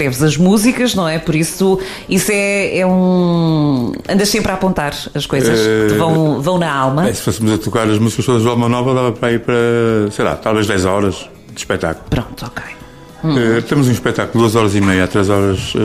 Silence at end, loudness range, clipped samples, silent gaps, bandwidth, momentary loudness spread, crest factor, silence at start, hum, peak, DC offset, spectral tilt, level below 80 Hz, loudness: 0 s; 4 LU; under 0.1%; none; 15.5 kHz; 7 LU; 14 dB; 0 s; none; 0 dBFS; under 0.1%; -5.5 dB/octave; -38 dBFS; -14 LUFS